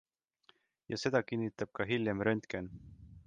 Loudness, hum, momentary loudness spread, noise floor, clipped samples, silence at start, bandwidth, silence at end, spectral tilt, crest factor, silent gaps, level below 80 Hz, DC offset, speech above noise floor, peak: -35 LUFS; none; 14 LU; -70 dBFS; under 0.1%; 0.9 s; 9.4 kHz; 0.05 s; -6 dB/octave; 20 dB; none; -64 dBFS; under 0.1%; 35 dB; -16 dBFS